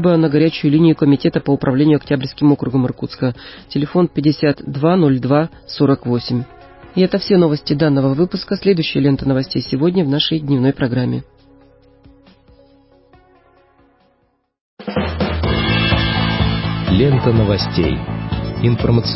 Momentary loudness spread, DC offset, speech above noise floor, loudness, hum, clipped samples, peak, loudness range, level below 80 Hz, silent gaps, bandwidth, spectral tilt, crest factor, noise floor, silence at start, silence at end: 9 LU; under 0.1%; 47 dB; -16 LUFS; none; under 0.1%; -2 dBFS; 7 LU; -34 dBFS; 14.61-14.77 s; 5.8 kHz; -11 dB/octave; 14 dB; -62 dBFS; 0 s; 0 s